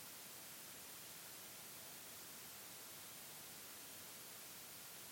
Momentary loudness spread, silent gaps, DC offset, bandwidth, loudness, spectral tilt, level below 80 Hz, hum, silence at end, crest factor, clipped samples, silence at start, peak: 0 LU; none; under 0.1%; 17 kHz; -52 LUFS; -1 dB/octave; -86 dBFS; none; 0 s; 14 dB; under 0.1%; 0 s; -42 dBFS